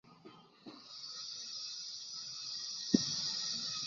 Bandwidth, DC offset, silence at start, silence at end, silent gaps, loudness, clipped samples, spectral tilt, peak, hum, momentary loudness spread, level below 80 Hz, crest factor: 7.2 kHz; under 0.1%; 0.05 s; 0 s; none; -38 LUFS; under 0.1%; -3 dB/octave; -12 dBFS; none; 23 LU; -76 dBFS; 28 dB